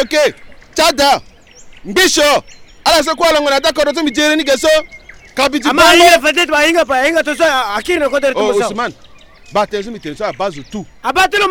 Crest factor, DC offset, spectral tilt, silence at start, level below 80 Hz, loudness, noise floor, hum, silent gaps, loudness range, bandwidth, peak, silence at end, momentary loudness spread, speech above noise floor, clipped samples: 14 dB; under 0.1%; -2 dB/octave; 0 s; -40 dBFS; -12 LUFS; -38 dBFS; none; none; 7 LU; over 20 kHz; 0 dBFS; 0 s; 13 LU; 25 dB; under 0.1%